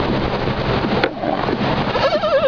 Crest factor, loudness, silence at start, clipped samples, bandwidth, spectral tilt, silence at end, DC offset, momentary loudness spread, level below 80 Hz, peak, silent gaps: 16 dB; -19 LUFS; 0 s; under 0.1%; 5.4 kHz; -7 dB/octave; 0 s; 0.5%; 3 LU; -34 dBFS; -2 dBFS; none